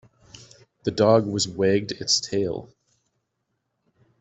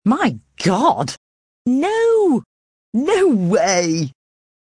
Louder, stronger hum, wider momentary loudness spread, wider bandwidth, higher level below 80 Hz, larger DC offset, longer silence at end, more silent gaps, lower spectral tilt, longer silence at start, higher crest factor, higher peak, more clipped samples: second, -22 LUFS vs -17 LUFS; neither; about the same, 11 LU vs 10 LU; second, 8.2 kHz vs 10.5 kHz; about the same, -60 dBFS vs -58 dBFS; neither; first, 1.55 s vs 0.5 s; second, none vs 1.17-1.65 s, 2.46-2.92 s; about the same, -4 dB/octave vs -5 dB/octave; first, 0.85 s vs 0.05 s; first, 22 dB vs 16 dB; about the same, -4 dBFS vs -2 dBFS; neither